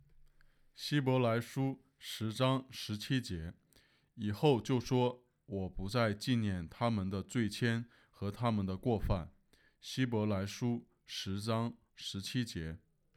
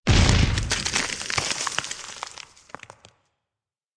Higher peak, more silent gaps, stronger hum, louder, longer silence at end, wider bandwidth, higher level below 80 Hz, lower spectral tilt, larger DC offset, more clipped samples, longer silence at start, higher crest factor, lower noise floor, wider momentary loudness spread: second, -16 dBFS vs -4 dBFS; neither; neither; second, -36 LUFS vs -23 LUFS; second, 0.4 s vs 1.6 s; first, 15.5 kHz vs 11 kHz; second, -56 dBFS vs -32 dBFS; first, -6 dB/octave vs -3.5 dB/octave; neither; neither; first, 0.8 s vs 0.05 s; about the same, 20 dB vs 22 dB; second, -69 dBFS vs -89 dBFS; second, 12 LU vs 23 LU